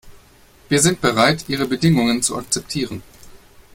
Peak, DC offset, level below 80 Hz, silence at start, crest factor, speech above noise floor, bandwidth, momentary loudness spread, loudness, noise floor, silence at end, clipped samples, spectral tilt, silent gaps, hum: 0 dBFS; under 0.1%; -48 dBFS; 0.05 s; 20 dB; 31 dB; 16.5 kHz; 10 LU; -18 LUFS; -49 dBFS; 0.4 s; under 0.1%; -4 dB/octave; none; none